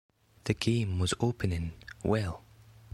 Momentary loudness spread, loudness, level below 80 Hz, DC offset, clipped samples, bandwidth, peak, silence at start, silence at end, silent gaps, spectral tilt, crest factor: 11 LU; -32 LUFS; -48 dBFS; under 0.1%; under 0.1%; 14 kHz; -12 dBFS; 0.45 s; 0.55 s; none; -5.5 dB/octave; 20 dB